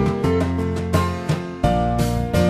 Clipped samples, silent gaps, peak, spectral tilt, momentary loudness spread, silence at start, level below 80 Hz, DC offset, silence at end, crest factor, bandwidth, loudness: under 0.1%; none; -4 dBFS; -7 dB/octave; 4 LU; 0 s; -32 dBFS; under 0.1%; 0 s; 16 dB; 15 kHz; -21 LUFS